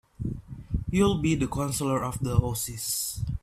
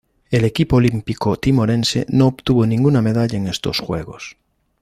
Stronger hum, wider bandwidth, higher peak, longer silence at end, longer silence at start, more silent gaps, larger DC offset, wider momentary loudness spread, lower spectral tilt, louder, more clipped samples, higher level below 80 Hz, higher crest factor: neither; first, 16 kHz vs 14 kHz; second, -8 dBFS vs -2 dBFS; second, 0.05 s vs 0.5 s; about the same, 0.2 s vs 0.3 s; neither; neither; about the same, 11 LU vs 10 LU; second, -5 dB/octave vs -6.5 dB/octave; second, -28 LUFS vs -17 LUFS; neither; about the same, -40 dBFS vs -40 dBFS; about the same, 18 dB vs 14 dB